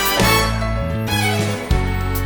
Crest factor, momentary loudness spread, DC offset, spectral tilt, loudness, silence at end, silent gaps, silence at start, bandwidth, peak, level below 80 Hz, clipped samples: 16 dB; 7 LU; under 0.1%; -4 dB/octave; -18 LUFS; 0 s; none; 0 s; over 20 kHz; -2 dBFS; -24 dBFS; under 0.1%